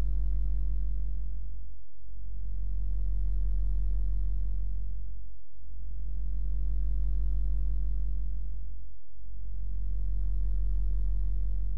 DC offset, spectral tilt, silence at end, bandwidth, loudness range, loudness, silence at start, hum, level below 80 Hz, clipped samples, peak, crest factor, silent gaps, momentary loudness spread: 4%; -10.5 dB/octave; 0 s; 0.9 kHz; 2 LU; -36 LUFS; 0 s; none; -32 dBFS; under 0.1%; -20 dBFS; 8 dB; none; 14 LU